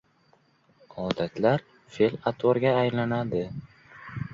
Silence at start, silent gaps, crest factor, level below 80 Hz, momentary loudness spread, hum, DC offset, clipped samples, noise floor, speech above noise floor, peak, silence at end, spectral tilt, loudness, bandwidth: 0.95 s; none; 20 dB; -58 dBFS; 18 LU; none; under 0.1%; under 0.1%; -64 dBFS; 38 dB; -6 dBFS; 0 s; -8 dB/octave; -26 LUFS; 7.6 kHz